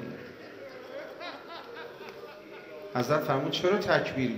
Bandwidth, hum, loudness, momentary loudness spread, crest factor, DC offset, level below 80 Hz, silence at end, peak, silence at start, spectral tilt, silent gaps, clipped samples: 16 kHz; none; -29 LUFS; 18 LU; 22 dB; under 0.1%; -66 dBFS; 0 s; -10 dBFS; 0 s; -5.5 dB/octave; none; under 0.1%